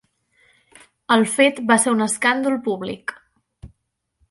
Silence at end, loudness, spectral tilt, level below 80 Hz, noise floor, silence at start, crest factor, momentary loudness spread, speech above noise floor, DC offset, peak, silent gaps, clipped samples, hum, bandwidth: 0.65 s; -19 LUFS; -3 dB/octave; -58 dBFS; -73 dBFS; 1.1 s; 20 dB; 13 LU; 54 dB; under 0.1%; -2 dBFS; none; under 0.1%; none; 11.5 kHz